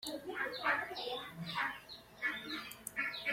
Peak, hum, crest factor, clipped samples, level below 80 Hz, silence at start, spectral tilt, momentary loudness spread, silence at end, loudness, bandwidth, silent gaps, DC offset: -22 dBFS; none; 20 dB; under 0.1%; -72 dBFS; 0 s; -2.5 dB/octave; 8 LU; 0 s; -39 LUFS; 16.5 kHz; none; under 0.1%